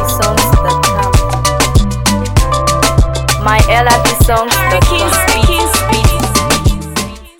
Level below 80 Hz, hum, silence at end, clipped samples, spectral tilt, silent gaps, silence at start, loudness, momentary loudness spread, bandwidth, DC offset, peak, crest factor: -16 dBFS; none; 0.1 s; under 0.1%; -4 dB/octave; none; 0 s; -11 LUFS; 4 LU; 19 kHz; under 0.1%; 0 dBFS; 10 dB